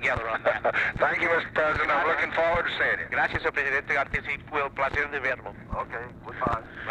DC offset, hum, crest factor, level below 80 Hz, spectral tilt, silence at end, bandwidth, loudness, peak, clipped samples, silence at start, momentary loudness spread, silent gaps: under 0.1%; none; 16 dB; -48 dBFS; -5.5 dB/octave; 0 s; 10.5 kHz; -26 LUFS; -10 dBFS; under 0.1%; 0 s; 10 LU; none